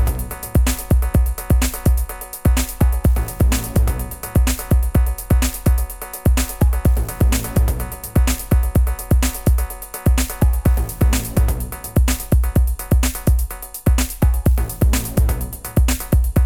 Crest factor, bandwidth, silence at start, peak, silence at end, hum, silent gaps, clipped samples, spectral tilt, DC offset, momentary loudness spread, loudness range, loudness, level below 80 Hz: 14 dB; 18.5 kHz; 0 s; -4 dBFS; 0 s; none; none; under 0.1%; -5.5 dB/octave; under 0.1%; 5 LU; 1 LU; -19 LUFS; -18 dBFS